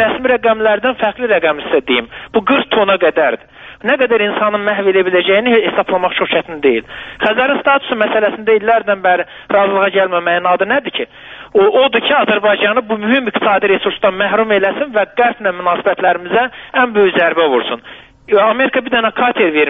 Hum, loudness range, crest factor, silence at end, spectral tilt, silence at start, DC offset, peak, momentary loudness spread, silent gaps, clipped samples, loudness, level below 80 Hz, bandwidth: none; 1 LU; 12 dB; 0 s; -1.5 dB/octave; 0 s; under 0.1%; 0 dBFS; 5 LU; none; under 0.1%; -13 LUFS; -52 dBFS; 4 kHz